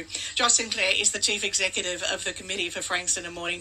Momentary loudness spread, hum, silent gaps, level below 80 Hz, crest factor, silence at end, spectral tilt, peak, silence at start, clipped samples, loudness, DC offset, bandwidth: 9 LU; none; none; -58 dBFS; 20 dB; 0 s; 0.5 dB/octave; -6 dBFS; 0 s; under 0.1%; -24 LUFS; under 0.1%; 15 kHz